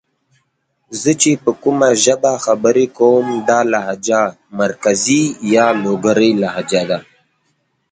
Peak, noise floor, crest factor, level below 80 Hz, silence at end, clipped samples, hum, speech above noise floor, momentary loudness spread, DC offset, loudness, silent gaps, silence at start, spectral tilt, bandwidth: 0 dBFS; -66 dBFS; 16 dB; -58 dBFS; 0.9 s; under 0.1%; none; 52 dB; 7 LU; under 0.1%; -14 LUFS; none; 0.9 s; -4 dB/octave; 9.6 kHz